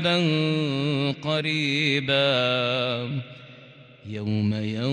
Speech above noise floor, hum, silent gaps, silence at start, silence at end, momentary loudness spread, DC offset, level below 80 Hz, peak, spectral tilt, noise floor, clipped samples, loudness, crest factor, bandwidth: 24 dB; none; none; 0 s; 0 s; 12 LU; under 0.1%; -66 dBFS; -10 dBFS; -6 dB/octave; -48 dBFS; under 0.1%; -24 LUFS; 14 dB; 10 kHz